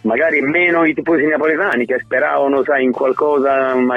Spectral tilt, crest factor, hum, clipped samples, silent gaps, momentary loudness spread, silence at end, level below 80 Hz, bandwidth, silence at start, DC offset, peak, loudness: -7 dB/octave; 12 dB; none; under 0.1%; none; 3 LU; 0 s; -60 dBFS; 8 kHz; 0.05 s; under 0.1%; -4 dBFS; -15 LUFS